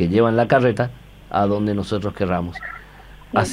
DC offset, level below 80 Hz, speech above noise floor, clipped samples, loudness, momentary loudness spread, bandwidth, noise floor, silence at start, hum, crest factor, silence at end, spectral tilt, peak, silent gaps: under 0.1%; -44 dBFS; 23 dB; under 0.1%; -20 LUFS; 14 LU; 14.5 kHz; -42 dBFS; 0 s; 50 Hz at -40 dBFS; 18 dB; 0 s; -7 dB/octave; -2 dBFS; none